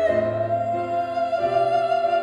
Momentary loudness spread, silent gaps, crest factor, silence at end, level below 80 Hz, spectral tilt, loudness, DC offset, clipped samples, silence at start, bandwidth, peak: 4 LU; none; 12 dB; 0 s; -56 dBFS; -7 dB/octave; -22 LUFS; under 0.1%; under 0.1%; 0 s; 8.8 kHz; -10 dBFS